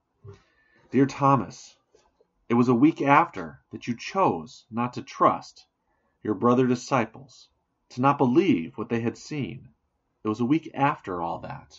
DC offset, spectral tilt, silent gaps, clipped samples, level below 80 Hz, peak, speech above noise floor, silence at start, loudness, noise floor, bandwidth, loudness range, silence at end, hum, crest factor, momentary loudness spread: under 0.1%; -6 dB/octave; none; under 0.1%; -64 dBFS; -4 dBFS; 50 dB; 0.25 s; -25 LUFS; -74 dBFS; 7.8 kHz; 3 LU; 0.2 s; none; 22 dB; 15 LU